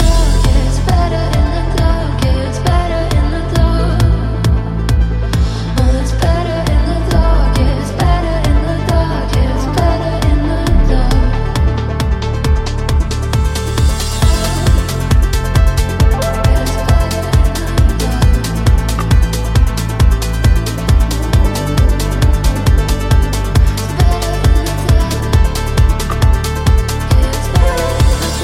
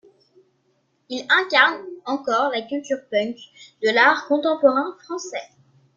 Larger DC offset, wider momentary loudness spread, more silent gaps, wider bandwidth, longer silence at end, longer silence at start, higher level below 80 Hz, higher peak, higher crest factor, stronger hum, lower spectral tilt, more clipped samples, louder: neither; second, 2 LU vs 16 LU; neither; first, 16 kHz vs 7.6 kHz; second, 0 s vs 0.5 s; second, 0 s vs 1.1 s; first, -14 dBFS vs -74 dBFS; about the same, 0 dBFS vs -2 dBFS; second, 12 dB vs 20 dB; neither; first, -6 dB/octave vs -2.5 dB/octave; neither; first, -14 LUFS vs -20 LUFS